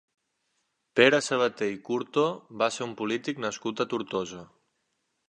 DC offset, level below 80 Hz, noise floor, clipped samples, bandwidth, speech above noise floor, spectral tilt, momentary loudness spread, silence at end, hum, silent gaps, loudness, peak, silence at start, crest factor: under 0.1%; -72 dBFS; -77 dBFS; under 0.1%; 11 kHz; 50 dB; -4 dB/octave; 12 LU; 0.85 s; none; none; -27 LUFS; -4 dBFS; 0.95 s; 26 dB